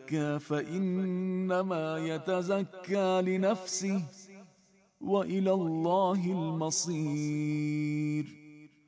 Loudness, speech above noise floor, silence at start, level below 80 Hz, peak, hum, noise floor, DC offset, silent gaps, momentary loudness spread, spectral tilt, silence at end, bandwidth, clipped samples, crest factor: -31 LUFS; 35 dB; 0 s; -76 dBFS; -16 dBFS; none; -66 dBFS; under 0.1%; none; 6 LU; -5.5 dB/octave; 0.2 s; 8 kHz; under 0.1%; 16 dB